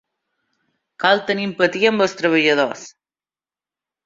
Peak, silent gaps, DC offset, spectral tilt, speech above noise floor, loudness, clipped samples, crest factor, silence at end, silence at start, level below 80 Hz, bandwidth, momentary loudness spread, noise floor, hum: -2 dBFS; none; under 0.1%; -4.5 dB/octave; over 72 dB; -18 LUFS; under 0.1%; 20 dB; 1.15 s; 1 s; -66 dBFS; 7.8 kHz; 7 LU; under -90 dBFS; none